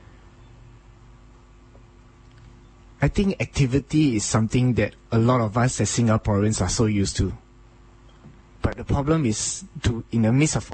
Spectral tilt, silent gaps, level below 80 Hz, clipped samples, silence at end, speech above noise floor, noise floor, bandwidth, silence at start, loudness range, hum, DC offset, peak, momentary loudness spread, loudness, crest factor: -5.5 dB/octave; none; -38 dBFS; under 0.1%; 0 s; 28 dB; -50 dBFS; 8.8 kHz; 3 s; 6 LU; none; under 0.1%; -6 dBFS; 7 LU; -22 LUFS; 16 dB